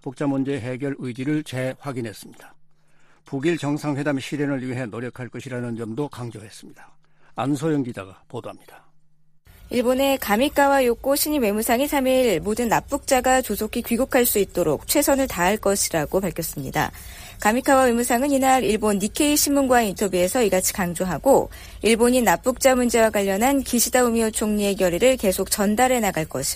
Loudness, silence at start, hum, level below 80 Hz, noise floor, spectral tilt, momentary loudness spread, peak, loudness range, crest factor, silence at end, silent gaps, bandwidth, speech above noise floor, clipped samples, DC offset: -21 LUFS; 0.05 s; none; -44 dBFS; -52 dBFS; -4 dB/octave; 13 LU; -4 dBFS; 10 LU; 18 dB; 0 s; none; 15.5 kHz; 31 dB; under 0.1%; under 0.1%